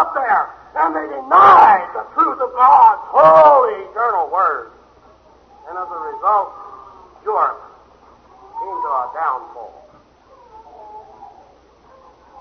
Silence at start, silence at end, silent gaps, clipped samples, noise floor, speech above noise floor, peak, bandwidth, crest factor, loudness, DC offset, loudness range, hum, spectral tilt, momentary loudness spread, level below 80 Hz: 0 s; 1.15 s; none; under 0.1%; -49 dBFS; 35 dB; 0 dBFS; 6.4 kHz; 16 dB; -13 LUFS; under 0.1%; 16 LU; none; -6 dB/octave; 21 LU; -58 dBFS